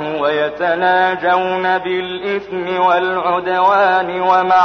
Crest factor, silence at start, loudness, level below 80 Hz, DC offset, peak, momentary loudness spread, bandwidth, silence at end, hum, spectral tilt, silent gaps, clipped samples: 12 dB; 0 s; -15 LUFS; -54 dBFS; under 0.1%; -2 dBFS; 8 LU; 6.4 kHz; 0 s; none; -6 dB/octave; none; under 0.1%